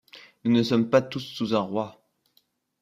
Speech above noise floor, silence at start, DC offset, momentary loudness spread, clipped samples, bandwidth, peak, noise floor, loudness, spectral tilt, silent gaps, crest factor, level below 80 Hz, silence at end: 44 dB; 0.15 s; under 0.1%; 11 LU; under 0.1%; 14 kHz; -6 dBFS; -68 dBFS; -25 LUFS; -6.5 dB/octave; none; 20 dB; -66 dBFS; 0.9 s